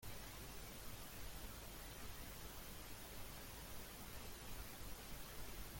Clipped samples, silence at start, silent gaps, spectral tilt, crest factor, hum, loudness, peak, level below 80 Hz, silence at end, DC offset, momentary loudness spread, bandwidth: under 0.1%; 0 s; none; -3 dB/octave; 14 dB; none; -53 LUFS; -38 dBFS; -58 dBFS; 0 s; under 0.1%; 1 LU; 17 kHz